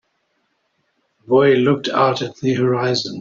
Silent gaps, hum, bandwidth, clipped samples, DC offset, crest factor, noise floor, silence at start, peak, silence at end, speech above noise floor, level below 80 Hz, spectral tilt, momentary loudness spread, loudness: none; none; 7.6 kHz; under 0.1%; under 0.1%; 16 dB; -68 dBFS; 1.3 s; -2 dBFS; 0 s; 51 dB; -60 dBFS; -6 dB/octave; 7 LU; -17 LUFS